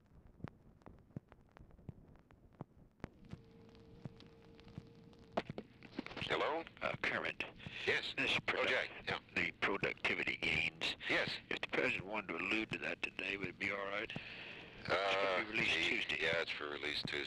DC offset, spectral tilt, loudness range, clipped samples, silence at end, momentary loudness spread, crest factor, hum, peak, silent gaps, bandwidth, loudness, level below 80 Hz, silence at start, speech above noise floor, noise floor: under 0.1%; -4 dB/octave; 21 LU; under 0.1%; 0 s; 21 LU; 18 dB; none; -24 dBFS; none; 13.5 kHz; -38 LUFS; -66 dBFS; 0.15 s; 25 dB; -64 dBFS